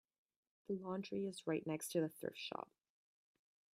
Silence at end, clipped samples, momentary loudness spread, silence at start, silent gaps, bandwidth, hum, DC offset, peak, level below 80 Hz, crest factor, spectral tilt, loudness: 1.1 s; under 0.1%; 9 LU; 0.7 s; none; 16 kHz; none; under 0.1%; -26 dBFS; -88 dBFS; 20 dB; -5 dB/octave; -44 LUFS